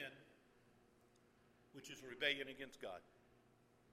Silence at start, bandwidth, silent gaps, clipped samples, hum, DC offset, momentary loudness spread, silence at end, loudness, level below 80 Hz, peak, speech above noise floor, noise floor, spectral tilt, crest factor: 0 s; 15.5 kHz; none; under 0.1%; none; under 0.1%; 20 LU; 0 s; -46 LUFS; -84 dBFS; -26 dBFS; 25 dB; -73 dBFS; -2.5 dB/octave; 26 dB